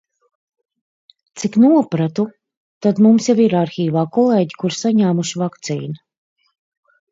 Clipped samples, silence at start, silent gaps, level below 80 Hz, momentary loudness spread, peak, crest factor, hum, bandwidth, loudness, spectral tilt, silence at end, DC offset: under 0.1%; 1.35 s; 2.57-2.81 s; -66 dBFS; 13 LU; -2 dBFS; 16 dB; none; 8 kHz; -16 LUFS; -6.5 dB/octave; 1.15 s; under 0.1%